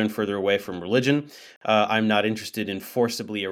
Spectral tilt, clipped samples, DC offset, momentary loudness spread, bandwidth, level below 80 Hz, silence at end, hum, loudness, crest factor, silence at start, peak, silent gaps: -5 dB/octave; under 0.1%; under 0.1%; 9 LU; 17 kHz; -68 dBFS; 0 s; none; -24 LUFS; 18 dB; 0 s; -6 dBFS; 1.56-1.61 s